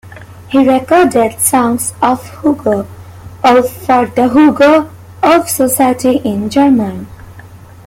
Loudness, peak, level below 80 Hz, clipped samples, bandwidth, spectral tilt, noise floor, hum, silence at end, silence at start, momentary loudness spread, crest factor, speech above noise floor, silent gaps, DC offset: -11 LUFS; 0 dBFS; -46 dBFS; under 0.1%; 17 kHz; -4.5 dB/octave; -34 dBFS; none; 0.3 s; 0.05 s; 7 LU; 12 dB; 24 dB; none; under 0.1%